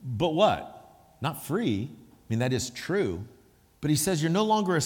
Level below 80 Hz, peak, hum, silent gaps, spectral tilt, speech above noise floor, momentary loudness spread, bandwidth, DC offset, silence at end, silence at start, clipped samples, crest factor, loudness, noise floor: -58 dBFS; -8 dBFS; none; none; -5 dB/octave; 30 dB; 11 LU; 19 kHz; under 0.1%; 0 s; 0 s; under 0.1%; 20 dB; -27 LUFS; -56 dBFS